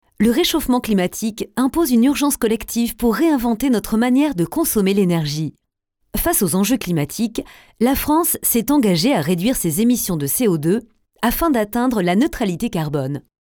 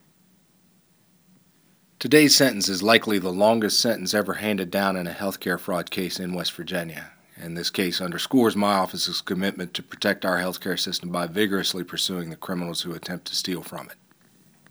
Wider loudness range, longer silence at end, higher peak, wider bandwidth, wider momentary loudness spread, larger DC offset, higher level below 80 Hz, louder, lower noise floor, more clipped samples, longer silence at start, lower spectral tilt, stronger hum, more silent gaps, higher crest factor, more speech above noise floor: second, 2 LU vs 8 LU; second, 0.25 s vs 0.75 s; second, -4 dBFS vs 0 dBFS; about the same, over 20 kHz vs over 20 kHz; second, 7 LU vs 13 LU; neither; first, -40 dBFS vs -68 dBFS; first, -18 LUFS vs -23 LUFS; first, -70 dBFS vs -61 dBFS; neither; second, 0.2 s vs 2 s; first, -5 dB/octave vs -3.5 dB/octave; neither; neither; second, 14 dB vs 24 dB; first, 53 dB vs 37 dB